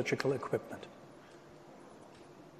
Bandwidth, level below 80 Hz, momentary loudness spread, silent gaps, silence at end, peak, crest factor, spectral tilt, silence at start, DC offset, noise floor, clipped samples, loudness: 13 kHz; -74 dBFS; 21 LU; none; 0 s; -16 dBFS; 24 dB; -5.5 dB/octave; 0 s; under 0.1%; -56 dBFS; under 0.1%; -37 LUFS